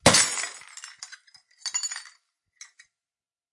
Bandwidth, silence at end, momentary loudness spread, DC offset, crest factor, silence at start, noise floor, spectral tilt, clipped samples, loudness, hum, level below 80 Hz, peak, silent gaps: 11.5 kHz; 1.5 s; 28 LU; under 0.1%; 28 dB; 0.05 s; under -90 dBFS; -1.5 dB/octave; under 0.1%; -25 LUFS; none; -58 dBFS; -2 dBFS; none